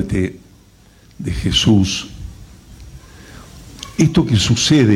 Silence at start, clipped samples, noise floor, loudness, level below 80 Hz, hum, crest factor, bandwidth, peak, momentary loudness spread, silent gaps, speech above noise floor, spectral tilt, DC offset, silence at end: 0 s; under 0.1%; -47 dBFS; -16 LUFS; -34 dBFS; none; 14 dB; 15.5 kHz; -4 dBFS; 25 LU; none; 33 dB; -5 dB/octave; under 0.1%; 0 s